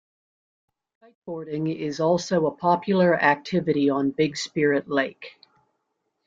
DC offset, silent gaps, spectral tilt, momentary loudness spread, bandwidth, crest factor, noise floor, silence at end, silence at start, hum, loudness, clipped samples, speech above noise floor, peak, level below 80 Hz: under 0.1%; none; -6 dB/octave; 12 LU; 7.8 kHz; 20 dB; -77 dBFS; 1 s; 1.25 s; none; -23 LUFS; under 0.1%; 54 dB; -4 dBFS; -66 dBFS